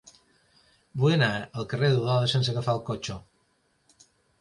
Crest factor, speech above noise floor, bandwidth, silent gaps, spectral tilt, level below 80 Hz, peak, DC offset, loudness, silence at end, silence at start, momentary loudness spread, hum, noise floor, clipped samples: 20 dB; 44 dB; 11 kHz; none; -6 dB/octave; -60 dBFS; -8 dBFS; under 0.1%; -26 LUFS; 1.2 s; 0.95 s; 13 LU; none; -69 dBFS; under 0.1%